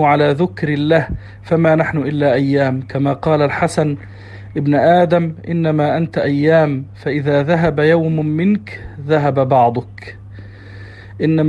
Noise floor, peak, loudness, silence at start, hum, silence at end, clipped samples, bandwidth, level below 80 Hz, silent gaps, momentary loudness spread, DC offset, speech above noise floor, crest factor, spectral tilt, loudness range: -34 dBFS; 0 dBFS; -15 LUFS; 0 s; none; 0 s; under 0.1%; 10.5 kHz; -44 dBFS; none; 21 LU; under 0.1%; 20 dB; 14 dB; -8 dB/octave; 2 LU